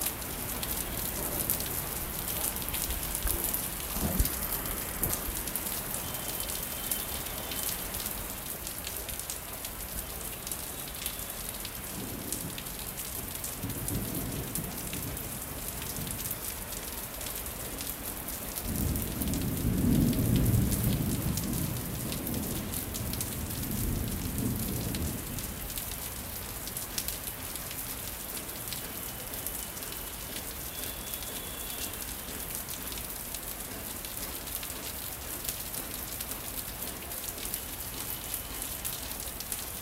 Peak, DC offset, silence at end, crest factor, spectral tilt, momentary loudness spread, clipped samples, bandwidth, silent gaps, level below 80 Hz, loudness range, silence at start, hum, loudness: -6 dBFS; under 0.1%; 0 s; 28 dB; -3.5 dB/octave; 7 LU; under 0.1%; 16.5 kHz; none; -44 dBFS; 6 LU; 0 s; none; -33 LUFS